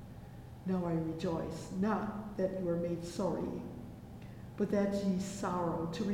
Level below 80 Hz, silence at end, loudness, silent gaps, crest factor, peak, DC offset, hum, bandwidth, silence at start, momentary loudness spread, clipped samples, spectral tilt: -56 dBFS; 0 s; -36 LUFS; none; 16 dB; -20 dBFS; under 0.1%; none; 16 kHz; 0 s; 16 LU; under 0.1%; -7 dB/octave